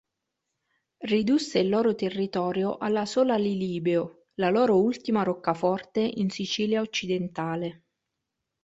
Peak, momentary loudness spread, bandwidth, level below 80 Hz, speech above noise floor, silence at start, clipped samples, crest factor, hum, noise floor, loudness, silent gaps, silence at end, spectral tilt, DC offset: -8 dBFS; 7 LU; 8.2 kHz; -66 dBFS; 58 dB; 1 s; under 0.1%; 18 dB; none; -84 dBFS; -26 LUFS; none; 0.9 s; -6 dB/octave; under 0.1%